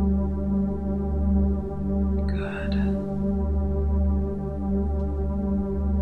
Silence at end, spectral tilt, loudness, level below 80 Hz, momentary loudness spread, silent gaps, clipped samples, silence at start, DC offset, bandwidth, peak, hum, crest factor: 0 s; -10.5 dB/octave; -26 LUFS; -28 dBFS; 4 LU; none; under 0.1%; 0 s; under 0.1%; 4.5 kHz; -10 dBFS; none; 14 dB